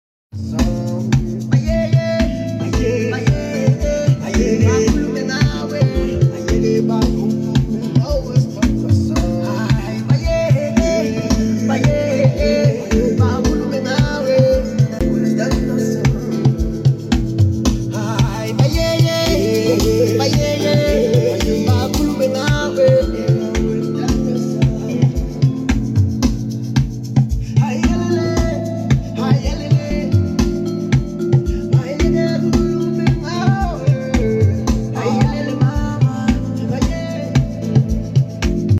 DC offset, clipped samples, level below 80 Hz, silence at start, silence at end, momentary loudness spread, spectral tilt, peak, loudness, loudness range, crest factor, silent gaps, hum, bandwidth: under 0.1%; under 0.1%; -26 dBFS; 0.35 s; 0 s; 4 LU; -7 dB/octave; -2 dBFS; -17 LUFS; 2 LU; 14 dB; none; none; 15 kHz